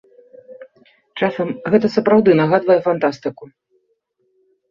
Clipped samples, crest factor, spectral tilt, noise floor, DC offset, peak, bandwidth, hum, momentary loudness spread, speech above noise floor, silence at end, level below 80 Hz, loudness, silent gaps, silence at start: under 0.1%; 16 dB; -8 dB/octave; -67 dBFS; under 0.1%; -2 dBFS; 7.2 kHz; none; 13 LU; 51 dB; 1.25 s; -60 dBFS; -16 LUFS; none; 0.5 s